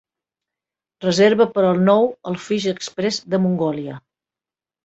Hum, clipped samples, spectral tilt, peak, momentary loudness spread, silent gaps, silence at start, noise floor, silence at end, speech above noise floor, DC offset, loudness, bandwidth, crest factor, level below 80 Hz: none; under 0.1%; -6 dB/octave; -2 dBFS; 13 LU; none; 1 s; under -90 dBFS; 0.85 s; over 72 dB; under 0.1%; -19 LUFS; 8.2 kHz; 18 dB; -62 dBFS